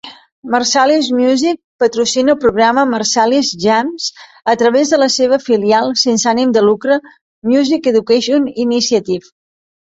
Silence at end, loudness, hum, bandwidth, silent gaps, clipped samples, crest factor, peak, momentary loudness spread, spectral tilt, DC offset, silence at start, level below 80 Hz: 0.6 s; -13 LUFS; none; 8.2 kHz; 0.32-0.43 s, 1.64-1.79 s, 7.21-7.42 s; under 0.1%; 12 dB; 0 dBFS; 6 LU; -3 dB/octave; under 0.1%; 0.05 s; -54 dBFS